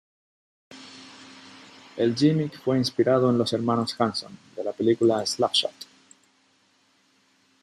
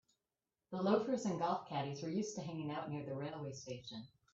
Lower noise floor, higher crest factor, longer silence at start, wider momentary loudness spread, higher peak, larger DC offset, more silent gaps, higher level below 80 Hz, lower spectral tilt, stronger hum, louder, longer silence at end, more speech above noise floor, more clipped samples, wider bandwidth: second, -64 dBFS vs under -90 dBFS; about the same, 20 dB vs 20 dB; about the same, 0.7 s vs 0.7 s; first, 23 LU vs 13 LU; first, -8 dBFS vs -20 dBFS; neither; neither; first, -70 dBFS vs -80 dBFS; about the same, -5.5 dB/octave vs -6 dB/octave; neither; first, -24 LUFS vs -41 LUFS; first, 1.8 s vs 0.25 s; second, 41 dB vs over 50 dB; neither; first, 13.5 kHz vs 8 kHz